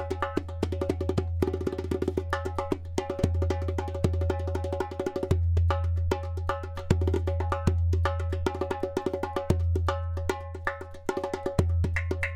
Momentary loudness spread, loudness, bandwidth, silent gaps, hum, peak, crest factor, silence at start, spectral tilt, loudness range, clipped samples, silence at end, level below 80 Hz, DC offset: 6 LU; -30 LUFS; 10 kHz; none; none; -8 dBFS; 20 dB; 0 s; -7.5 dB/octave; 2 LU; under 0.1%; 0 s; -36 dBFS; under 0.1%